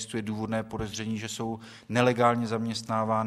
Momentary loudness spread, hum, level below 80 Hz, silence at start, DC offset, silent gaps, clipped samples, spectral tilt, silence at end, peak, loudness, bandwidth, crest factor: 11 LU; none; -56 dBFS; 0 s; under 0.1%; none; under 0.1%; -5.5 dB/octave; 0 s; -6 dBFS; -29 LUFS; 14 kHz; 22 dB